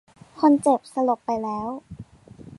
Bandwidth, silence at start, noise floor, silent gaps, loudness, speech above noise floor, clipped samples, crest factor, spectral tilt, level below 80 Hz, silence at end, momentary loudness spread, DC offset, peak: 11.5 kHz; 0.35 s; -46 dBFS; none; -23 LUFS; 24 dB; under 0.1%; 18 dB; -6.5 dB/octave; -58 dBFS; 0.15 s; 20 LU; under 0.1%; -6 dBFS